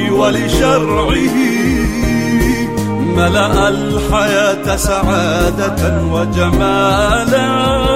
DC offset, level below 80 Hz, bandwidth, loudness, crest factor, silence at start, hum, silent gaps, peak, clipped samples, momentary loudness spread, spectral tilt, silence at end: 1%; -24 dBFS; 16 kHz; -13 LUFS; 12 dB; 0 s; none; none; -2 dBFS; under 0.1%; 3 LU; -5 dB/octave; 0 s